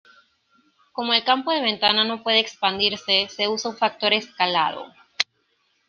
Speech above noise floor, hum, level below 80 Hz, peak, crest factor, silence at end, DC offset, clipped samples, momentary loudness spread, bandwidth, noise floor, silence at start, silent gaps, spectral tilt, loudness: 46 dB; none; -68 dBFS; -2 dBFS; 22 dB; 0.65 s; under 0.1%; under 0.1%; 8 LU; 13 kHz; -68 dBFS; 0.95 s; none; -2.5 dB/octave; -21 LUFS